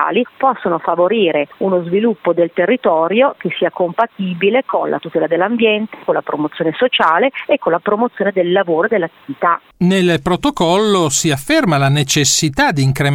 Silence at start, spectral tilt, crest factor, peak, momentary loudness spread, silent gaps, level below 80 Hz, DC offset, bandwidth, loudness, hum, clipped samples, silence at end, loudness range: 0 s; -4.5 dB/octave; 14 dB; -2 dBFS; 6 LU; none; -46 dBFS; under 0.1%; 17 kHz; -15 LUFS; none; under 0.1%; 0 s; 2 LU